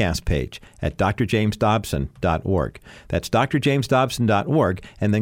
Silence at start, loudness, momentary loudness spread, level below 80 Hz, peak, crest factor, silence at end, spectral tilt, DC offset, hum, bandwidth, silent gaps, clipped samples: 0 s; -22 LUFS; 8 LU; -36 dBFS; -6 dBFS; 14 dB; 0 s; -6 dB/octave; under 0.1%; none; 16.5 kHz; none; under 0.1%